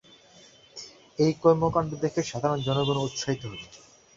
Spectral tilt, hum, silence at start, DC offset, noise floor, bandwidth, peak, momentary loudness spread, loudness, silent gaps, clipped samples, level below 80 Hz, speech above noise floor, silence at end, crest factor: -6 dB/octave; none; 0.75 s; under 0.1%; -54 dBFS; 7.8 kHz; -6 dBFS; 21 LU; -26 LUFS; none; under 0.1%; -56 dBFS; 29 dB; 0.4 s; 22 dB